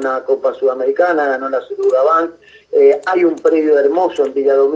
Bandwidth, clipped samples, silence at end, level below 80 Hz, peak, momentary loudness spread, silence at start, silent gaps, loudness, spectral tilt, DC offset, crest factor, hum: 7.6 kHz; under 0.1%; 0 s; -66 dBFS; 0 dBFS; 6 LU; 0 s; none; -14 LUFS; -5 dB/octave; under 0.1%; 14 dB; none